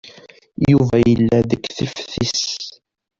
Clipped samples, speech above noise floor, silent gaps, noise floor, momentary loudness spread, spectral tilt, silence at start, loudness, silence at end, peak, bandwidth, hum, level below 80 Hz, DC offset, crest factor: under 0.1%; 29 dB; none; -45 dBFS; 13 LU; -5.5 dB/octave; 0.05 s; -18 LUFS; 0.5 s; -2 dBFS; 7.6 kHz; none; -42 dBFS; under 0.1%; 16 dB